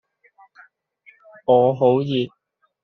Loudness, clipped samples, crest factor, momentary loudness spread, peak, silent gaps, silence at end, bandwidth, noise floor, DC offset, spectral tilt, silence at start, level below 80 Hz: -19 LUFS; under 0.1%; 18 dB; 13 LU; -4 dBFS; none; 0.55 s; 5.8 kHz; -55 dBFS; under 0.1%; -6 dB/octave; 1.5 s; -66 dBFS